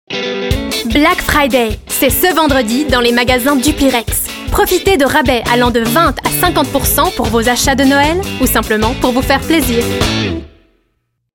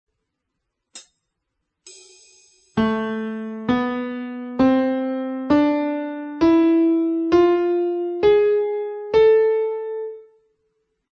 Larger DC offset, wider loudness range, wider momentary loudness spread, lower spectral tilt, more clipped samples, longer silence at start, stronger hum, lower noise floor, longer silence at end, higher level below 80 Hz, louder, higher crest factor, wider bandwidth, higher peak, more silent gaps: neither; second, 1 LU vs 9 LU; second, 6 LU vs 13 LU; second, -4 dB/octave vs -6.5 dB/octave; neither; second, 0.1 s vs 0.95 s; neither; second, -65 dBFS vs -78 dBFS; about the same, 0.9 s vs 0.95 s; first, -26 dBFS vs -52 dBFS; first, -12 LUFS vs -20 LUFS; about the same, 12 dB vs 16 dB; first, 17.5 kHz vs 8.6 kHz; first, 0 dBFS vs -6 dBFS; neither